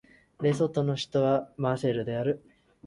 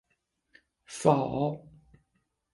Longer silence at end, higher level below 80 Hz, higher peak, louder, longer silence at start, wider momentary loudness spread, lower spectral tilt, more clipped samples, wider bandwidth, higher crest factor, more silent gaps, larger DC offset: second, 0 s vs 0.95 s; about the same, -62 dBFS vs -62 dBFS; second, -12 dBFS vs -6 dBFS; about the same, -28 LUFS vs -28 LUFS; second, 0.4 s vs 0.9 s; second, 5 LU vs 19 LU; about the same, -7 dB/octave vs -6.5 dB/octave; neither; about the same, 11.5 kHz vs 11.5 kHz; second, 16 dB vs 26 dB; neither; neither